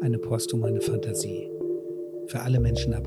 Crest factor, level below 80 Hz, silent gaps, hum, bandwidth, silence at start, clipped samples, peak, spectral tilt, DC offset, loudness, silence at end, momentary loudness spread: 14 dB; -38 dBFS; none; none; 13.5 kHz; 0 s; under 0.1%; -12 dBFS; -6 dB/octave; under 0.1%; -28 LUFS; 0 s; 9 LU